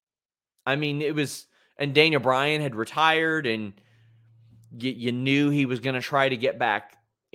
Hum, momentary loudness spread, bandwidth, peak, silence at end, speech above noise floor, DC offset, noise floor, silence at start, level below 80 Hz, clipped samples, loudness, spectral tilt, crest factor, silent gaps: none; 12 LU; 16 kHz; -4 dBFS; 0.5 s; over 66 dB; under 0.1%; under -90 dBFS; 0.65 s; -70 dBFS; under 0.1%; -24 LUFS; -5.5 dB/octave; 22 dB; none